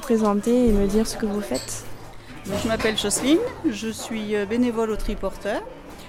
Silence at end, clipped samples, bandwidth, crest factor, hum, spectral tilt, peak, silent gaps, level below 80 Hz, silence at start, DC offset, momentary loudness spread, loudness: 0 s; under 0.1%; 16.5 kHz; 16 dB; none; -4.5 dB/octave; -6 dBFS; none; -36 dBFS; 0 s; under 0.1%; 13 LU; -23 LUFS